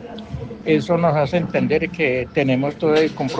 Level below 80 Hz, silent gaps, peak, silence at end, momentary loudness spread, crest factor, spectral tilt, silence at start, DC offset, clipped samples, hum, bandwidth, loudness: -48 dBFS; none; -4 dBFS; 0 s; 11 LU; 16 dB; -7 dB/octave; 0 s; under 0.1%; under 0.1%; none; 8.2 kHz; -19 LUFS